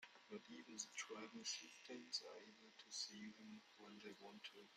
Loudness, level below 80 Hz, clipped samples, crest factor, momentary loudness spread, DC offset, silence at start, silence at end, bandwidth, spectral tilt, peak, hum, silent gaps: -54 LUFS; under -90 dBFS; under 0.1%; 24 dB; 12 LU; under 0.1%; 0 s; 0 s; 15.5 kHz; -1 dB/octave; -32 dBFS; none; none